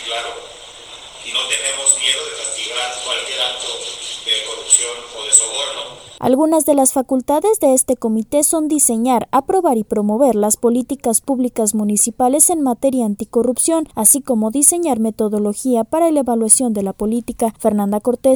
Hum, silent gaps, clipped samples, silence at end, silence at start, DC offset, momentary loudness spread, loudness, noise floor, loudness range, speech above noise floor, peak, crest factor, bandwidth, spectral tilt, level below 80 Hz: none; none; under 0.1%; 0 s; 0 s; under 0.1%; 11 LU; -15 LUFS; -36 dBFS; 4 LU; 20 dB; 0 dBFS; 16 dB; over 20 kHz; -2.5 dB/octave; -52 dBFS